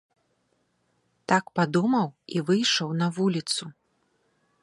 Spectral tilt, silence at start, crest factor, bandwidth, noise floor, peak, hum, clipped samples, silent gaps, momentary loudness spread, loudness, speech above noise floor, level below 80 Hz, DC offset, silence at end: -4.5 dB/octave; 1.3 s; 22 dB; 11.5 kHz; -72 dBFS; -6 dBFS; none; under 0.1%; none; 8 LU; -25 LUFS; 47 dB; -72 dBFS; under 0.1%; 0.9 s